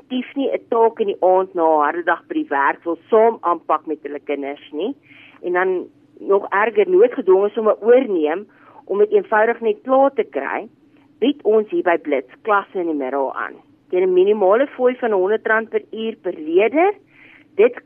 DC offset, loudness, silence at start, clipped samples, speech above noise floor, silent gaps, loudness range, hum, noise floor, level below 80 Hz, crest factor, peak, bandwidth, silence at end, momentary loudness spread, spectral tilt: under 0.1%; -18 LUFS; 0.1 s; under 0.1%; 30 dB; none; 4 LU; none; -48 dBFS; -74 dBFS; 16 dB; -4 dBFS; 3.5 kHz; 0.05 s; 12 LU; -8.5 dB/octave